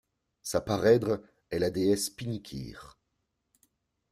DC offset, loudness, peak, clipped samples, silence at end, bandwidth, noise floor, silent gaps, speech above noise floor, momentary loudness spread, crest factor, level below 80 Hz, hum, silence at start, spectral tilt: under 0.1%; -29 LUFS; -10 dBFS; under 0.1%; 1.25 s; 15 kHz; -80 dBFS; none; 52 dB; 18 LU; 22 dB; -58 dBFS; none; 0.45 s; -5 dB/octave